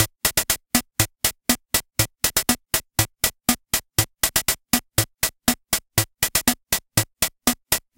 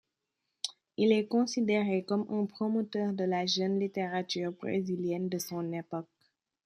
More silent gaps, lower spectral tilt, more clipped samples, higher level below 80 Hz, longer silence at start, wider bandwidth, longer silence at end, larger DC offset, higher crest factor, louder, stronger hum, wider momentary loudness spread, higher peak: neither; second, -2 dB/octave vs -5.5 dB/octave; neither; first, -42 dBFS vs -78 dBFS; second, 0 s vs 0.65 s; first, 17.5 kHz vs 14.5 kHz; second, 0.2 s vs 0.6 s; neither; about the same, 22 dB vs 20 dB; first, -21 LUFS vs -32 LUFS; neither; second, 4 LU vs 11 LU; first, 0 dBFS vs -12 dBFS